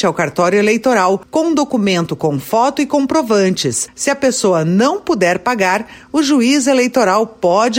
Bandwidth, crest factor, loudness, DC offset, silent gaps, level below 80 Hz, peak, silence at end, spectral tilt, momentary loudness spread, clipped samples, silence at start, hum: 16.5 kHz; 12 dB; -14 LUFS; under 0.1%; none; -54 dBFS; -2 dBFS; 0 s; -4.5 dB/octave; 5 LU; under 0.1%; 0 s; none